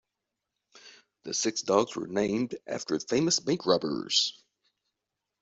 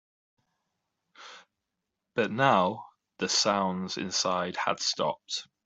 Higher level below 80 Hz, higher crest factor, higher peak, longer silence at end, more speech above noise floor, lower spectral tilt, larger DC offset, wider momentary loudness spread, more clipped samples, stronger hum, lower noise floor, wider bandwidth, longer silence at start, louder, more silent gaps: about the same, -70 dBFS vs -74 dBFS; about the same, 22 dB vs 22 dB; about the same, -8 dBFS vs -8 dBFS; first, 1.1 s vs 0.2 s; about the same, 58 dB vs 57 dB; about the same, -3.5 dB/octave vs -3 dB/octave; neither; second, 8 LU vs 15 LU; neither; neither; about the same, -86 dBFS vs -85 dBFS; about the same, 8.2 kHz vs 8.2 kHz; second, 0.75 s vs 1.2 s; about the same, -28 LUFS vs -28 LUFS; neither